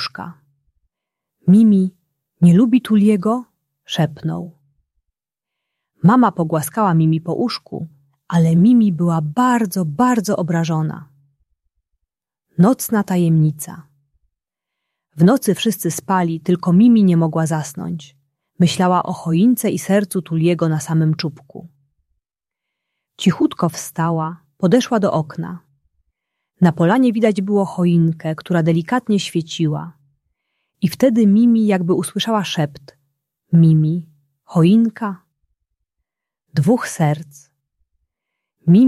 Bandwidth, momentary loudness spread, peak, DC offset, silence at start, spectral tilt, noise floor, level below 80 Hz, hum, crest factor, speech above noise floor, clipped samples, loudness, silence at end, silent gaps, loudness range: 14 kHz; 14 LU; -2 dBFS; under 0.1%; 0 s; -7 dB/octave; -84 dBFS; -60 dBFS; none; 16 dB; 69 dB; under 0.1%; -17 LUFS; 0 s; none; 5 LU